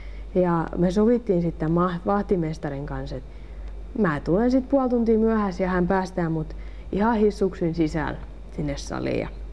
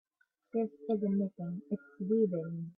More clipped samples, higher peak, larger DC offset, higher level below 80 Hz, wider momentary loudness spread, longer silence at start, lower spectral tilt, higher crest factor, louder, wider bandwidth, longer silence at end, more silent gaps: neither; first, -8 dBFS vs -18 dBFS; first, 0.5% vs under 0.1%; first, -38 dBFS vs -80 dBFS; first, 15 LU vs 9 LU; second, 0 s vs 0.55 s; second, -8 dB/octave vs -12.5 dB/octave; about the same, 16 dB vs 16 dB; first, -24 LUFS vs -35 LUFS; first, 10.5 kHz vs 3.8 kHz; about the same, 0 s vs 0.05 s; neither